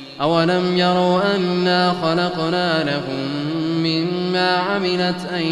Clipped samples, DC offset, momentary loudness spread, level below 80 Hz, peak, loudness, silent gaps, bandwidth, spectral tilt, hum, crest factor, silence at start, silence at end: under 0.1%; under 0.1%; 6 LU; -58 dBFS; -4 dBFS; -19 LUFS; none; 11.5 kHz; -6 dB/octave; none; 16 dB; 0 s; 0 s